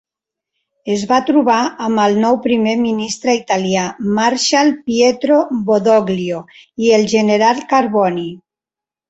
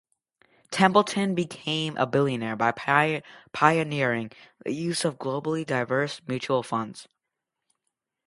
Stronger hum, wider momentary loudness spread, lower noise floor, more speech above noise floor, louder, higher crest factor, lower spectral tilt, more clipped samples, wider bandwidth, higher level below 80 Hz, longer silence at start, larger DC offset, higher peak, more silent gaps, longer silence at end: neither; second, 8 LU vs 12 LU; about the same, -88 dBFS vs -85 dBFS; first, 74 dB vs 59 dB; first, -15 LUFS vs -25 LUFS; second, 14 dB vs 24 dB; about the same, -4.5 dB/octave vs -5 dB/octave; neither; second, 8.2 kHz vs 11.5 kHz; first, -58 dBFS vs -68 dBFS; first, 0.85 s vs 0.7 s; neither; about the same, 0 dBFS vs -2 dBFS; neither; second, 0.7 s vs 1.25 s